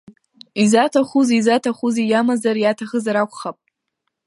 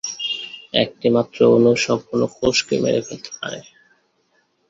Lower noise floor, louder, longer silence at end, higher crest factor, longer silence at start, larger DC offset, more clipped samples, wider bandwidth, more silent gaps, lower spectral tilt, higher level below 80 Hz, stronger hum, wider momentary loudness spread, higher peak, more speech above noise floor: first, -76 dBFS vs -64 dBFS; about the same, -18 LUFS vs -19 LUFS; second, 0.75 s vs 1.1 s; about the same, 16 dB vs 18 dB; first, 0.55 s vs 0.05 s; neither; neither; first, 11.5 kHz vs 7.8 kHz; neither; about the same, -4.5 dB/octave vs -4.5 dB/octave; second, -68 dBFS vs -54 dBFS; neither; second, 9 LU vs 15 LU; about the same, -2 dBFS vs -2 dBFS; first, 59 dB vs 46 dB